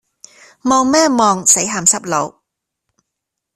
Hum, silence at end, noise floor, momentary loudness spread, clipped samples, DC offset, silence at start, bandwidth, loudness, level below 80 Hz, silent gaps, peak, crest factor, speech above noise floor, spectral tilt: none; 1.25 s; -79 dBFS; 10 LU; under 0.1%; under 0.1%; 0.65 s; 15.5 kHz; -13 LUFS; -56 dBFS; none; 0 dBFS; 16 dB; 65 dB; -2.5 dB/octave